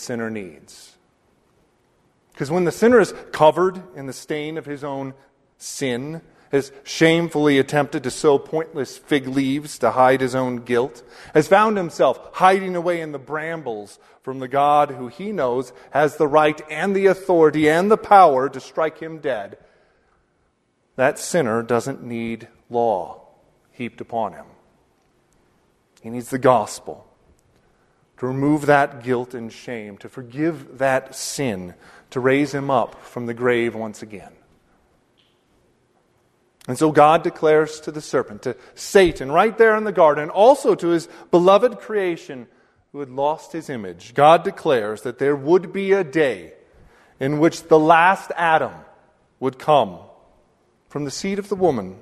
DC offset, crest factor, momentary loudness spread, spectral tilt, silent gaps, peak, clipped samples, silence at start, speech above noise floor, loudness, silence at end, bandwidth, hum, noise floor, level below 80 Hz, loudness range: under 0.1%; 20 dB; 17 LU; -5.5 dB/octave; none; 0 dBFS; under 0.1%; 0 s; 47 dB; -19 LUFS; 0.05 s; 13.5 kHz; none; -66 dBFS; -56 dBFS; 8 LU